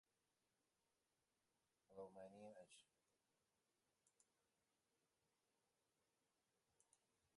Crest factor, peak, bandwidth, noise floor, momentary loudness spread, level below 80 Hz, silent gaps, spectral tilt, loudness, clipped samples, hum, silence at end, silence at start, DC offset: 24 dB; -46 dBFS; 11 kHz; under -90 dBFS; 7 LU; under -90 dBFS; none; -4.5 dB/octave; -63 LUFS; under 0.1%; none; 0.1 s; 1.9 s; under 0.1%